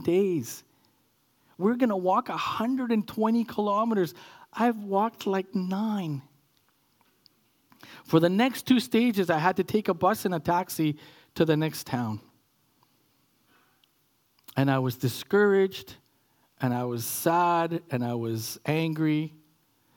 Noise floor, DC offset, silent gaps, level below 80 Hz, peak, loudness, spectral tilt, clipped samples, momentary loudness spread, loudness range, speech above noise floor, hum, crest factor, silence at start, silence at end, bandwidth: -69 dBFS; under 0.1%; none; -70 dBFS; -6 dBFS; -27 LUFS; -6 dB/octave; under 0.1%; 9 LU; 7 LU; 43 dB; none; 22 dB; 0 s; 0.7 s; 18 kHz